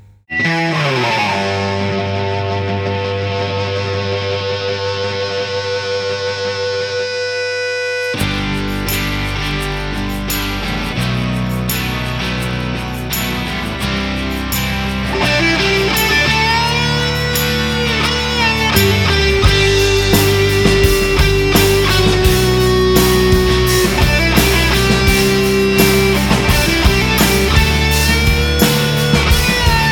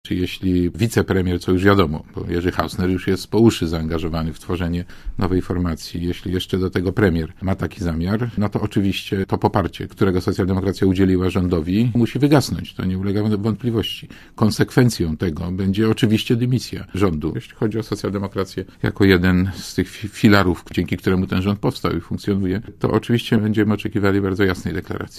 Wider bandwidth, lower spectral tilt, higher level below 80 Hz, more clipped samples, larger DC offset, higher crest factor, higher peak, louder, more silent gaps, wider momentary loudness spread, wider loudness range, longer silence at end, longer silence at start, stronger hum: first, over 20 kHz vs 15.5 kHz; second, -4.5 dB/octave vs -6.5 dB/octave; first, -22 dBFS vs -34 dBFS; neither; neither; second, 14 dB vs 20 dB; about the same, 0 dBFS vs 0 dBFS; first, -14 LUFS vs -20 LUFS; neither; about the same, 7 LU vs 9 LU; first, 7 LU vs 3 LU; about the same, 0 s vs 0 s; first, 0.3 s vs 0.05 s; neither